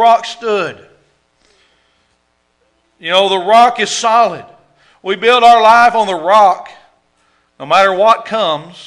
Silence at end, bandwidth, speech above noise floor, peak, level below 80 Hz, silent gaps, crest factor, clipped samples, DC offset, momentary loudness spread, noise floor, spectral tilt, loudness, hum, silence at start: 0.2 s; 12 kHz; 50 dB; 0 dBFS; -58 dBFS; none; 12 dB; 1%; under 0.1%; 15 LU; -61 dBFS; -2.5 dB/octave; -11 LUFS; none; 0 s